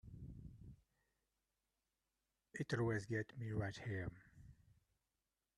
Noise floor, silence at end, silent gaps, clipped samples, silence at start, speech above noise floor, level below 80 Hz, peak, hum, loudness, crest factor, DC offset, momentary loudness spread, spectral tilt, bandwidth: under -90 dBFS; 1.05 s; none; under 0.1%; 0.05 s; over 47 dB; -68 dBFS; -28 dBFS; none; -45 LUFS; 20 dB; under 0.1%; 23 LU; -6.5 dB/octave; 11.5 kHz